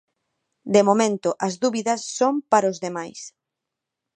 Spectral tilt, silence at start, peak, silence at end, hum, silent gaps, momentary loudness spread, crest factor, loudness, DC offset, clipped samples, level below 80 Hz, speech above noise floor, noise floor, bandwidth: -4.5 dB/octave; 0.65 s; -2 dBFS; 0.85 s; none; none; 18 LU; 20 dB; -21 LUFS; under 0.1%; under 0.1%; -70 dBFS; 63 dB; -84 dBFS; 10 kHz